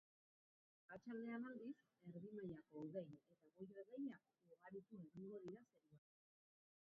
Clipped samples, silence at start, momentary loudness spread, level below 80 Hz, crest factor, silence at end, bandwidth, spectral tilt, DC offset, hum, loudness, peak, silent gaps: under 0.1%; 0.9 s; 11 LU; under -90 dBFS; 18 dB; 0.9 s; 4.8 kHz; -7.5 dB/octave; under 0.1%; none; -56 LUFS; -40 dBFS; none